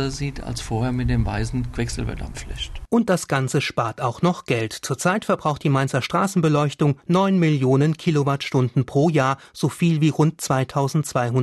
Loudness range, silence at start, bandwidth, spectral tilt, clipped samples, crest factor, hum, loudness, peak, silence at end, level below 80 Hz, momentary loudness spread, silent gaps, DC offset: 4 LU; 0 s; 12.5 kHz; -6 dB/octave; under 0.1%; 14 dB; none; -22 LUFS; -8 dBFS; 0 s; -38 dBFS; 8 LU; none; under 0.1%